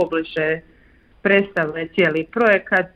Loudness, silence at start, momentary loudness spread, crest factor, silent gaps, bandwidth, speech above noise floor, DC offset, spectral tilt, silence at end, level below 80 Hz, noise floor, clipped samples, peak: -19 LUFS; 0 s; 6 LU; 16 dB; none; 7.4 kHz; 33 dB; under 0.1%; -7 dB/octave; 0.1 s; -54 dBFS; -52 dBFS; under 0.1%; -4 dBFS